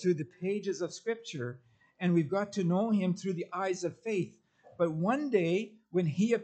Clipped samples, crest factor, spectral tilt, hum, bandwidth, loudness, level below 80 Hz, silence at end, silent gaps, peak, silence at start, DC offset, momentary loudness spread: under 0.1%; 16 dB; -7 dB/octave; none; 8.6 kHz; -32 LUFS; -78 dBFS; 0 s; none; -16 dBFS; 0 s; under 0.1%; 8 LU